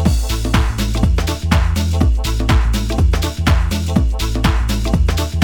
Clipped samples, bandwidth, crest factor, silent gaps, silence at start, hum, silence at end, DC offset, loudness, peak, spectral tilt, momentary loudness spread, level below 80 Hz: under 0.1%; 19 kHz; 14 dB; none; 0 s; none; 0 s; under 0.1%; -17 LUFS; 0 dBFS; -5.5 dB/octave; 3 LU; -18 dBFS